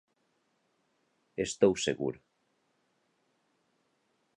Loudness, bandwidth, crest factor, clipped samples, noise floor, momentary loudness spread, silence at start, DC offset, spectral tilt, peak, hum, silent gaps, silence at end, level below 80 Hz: -30 LUFS; 11 kHz; 26 dB; under 0.1%; -76 dBFS; 17 LU; 1.4 s; under 0.1%; -4.5 dB/octave; -10 dBFS; none; none; 2.25 s; -68 dBFS